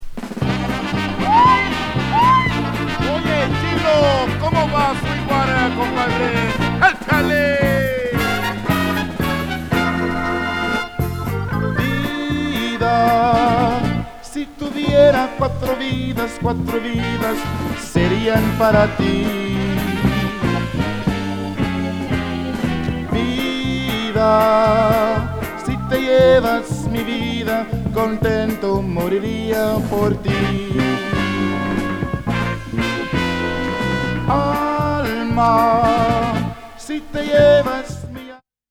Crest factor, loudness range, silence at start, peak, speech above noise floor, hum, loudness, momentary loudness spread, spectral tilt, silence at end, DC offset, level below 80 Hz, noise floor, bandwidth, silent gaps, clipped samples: 18 dB; 4 LU; 0 s; 0 dBFS; 23 dB; none; -18 LUFS; 9 LU; -6 dB/octave; 0.35 s; under 0.1%; -34 dBFS; -39 dBFS; 18 kHz; none; under 0.1%